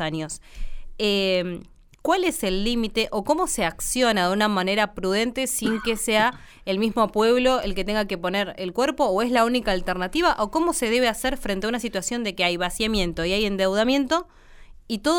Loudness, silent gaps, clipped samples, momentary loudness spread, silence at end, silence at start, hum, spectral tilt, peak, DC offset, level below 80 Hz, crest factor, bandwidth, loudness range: -23 LUFS; none; under 0.1%; 6 LU; 0 s; 0 s; none; -3.5 dB/octave; -8 dBFS; under 0.1%; -40 dBFS; 16 dB; 19.5 kHz; 2 LU